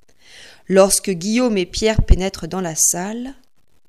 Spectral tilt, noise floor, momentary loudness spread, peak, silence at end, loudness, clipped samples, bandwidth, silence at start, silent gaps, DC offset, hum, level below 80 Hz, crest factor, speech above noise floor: -4 dB/octave; -45 dBFS; 12 LU; 0 dBFS; 0.55 s; -17 LUFS; under 0.1%; 15 kHz; 0.4 s; none; 0.4%; none; -26 dBFS; 18 dB; 28 dB